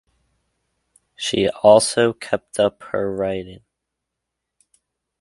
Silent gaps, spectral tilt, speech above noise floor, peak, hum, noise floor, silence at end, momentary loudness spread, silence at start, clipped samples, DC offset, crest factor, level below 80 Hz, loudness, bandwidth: none; -4 dB/octave; 62 dB; 0 dBFS; none; -81 dBFS; 1.65 s; 13 LU; 1.2 s; under 0.1%; under 0.1%; 22 dB; -54 dBFS; -19 LUFS; 11.5 kHz